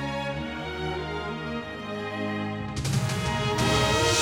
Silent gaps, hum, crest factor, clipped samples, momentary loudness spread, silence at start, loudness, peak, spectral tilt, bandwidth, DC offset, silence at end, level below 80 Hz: none; none; 18 dB; under 0.1%; 11 LU; 0 s; -28 LUFS; -10 dBFS; -4 dB/octave; 18.5 kHz; under 0.1%; 0 s; -42 dBFS